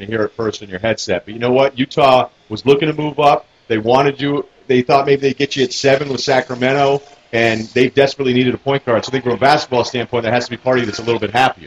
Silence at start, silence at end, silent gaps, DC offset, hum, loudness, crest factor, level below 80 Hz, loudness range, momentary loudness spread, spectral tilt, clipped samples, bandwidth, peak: 0 s; 0.15 s; none; under 0.1%; none; -16 LUFS; 16 dB; -52 dBFS; 1 LU; 7 LU; -5 dB/octave; under 0.1%; 10.5 kHz; 0 dBFS